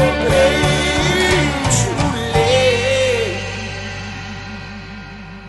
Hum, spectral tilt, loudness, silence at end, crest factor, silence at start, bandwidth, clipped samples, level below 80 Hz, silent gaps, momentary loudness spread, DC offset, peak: none; -4 dB/octave; -16 LUFS; 0 s; 14 dB; 0 s; 12 kHz; under 0.1%; -30 dBFS; none; 17 LU; under 0.1%; -2 dBFS